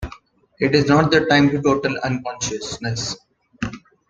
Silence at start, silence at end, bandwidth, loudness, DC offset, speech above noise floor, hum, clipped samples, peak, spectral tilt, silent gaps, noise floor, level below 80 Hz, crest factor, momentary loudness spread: 0 s; 0.3 s; 9.4 kHz; -19 LUFS; under 0.1%; 28 dB; none; under 0.1%; -2 dBFS; -5 dB/octave; none; -46 dBFS; -44 dBFS; 18 dB; 15 LU